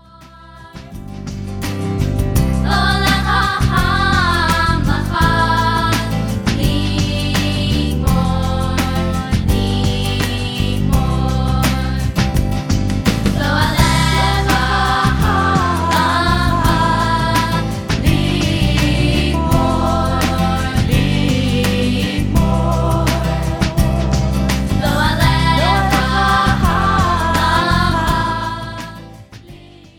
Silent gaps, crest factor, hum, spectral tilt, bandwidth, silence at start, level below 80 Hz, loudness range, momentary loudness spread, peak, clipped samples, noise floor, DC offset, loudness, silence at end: none; 14 dB; none; -5.5 dB/octave; 18 kHz; 0.2 s; -22 dBFS; 3 LU; 5 LU; 0 dBFS; under 0.1%; -40 dBFS; under 0.1%; -15 LUFS; 0.4 s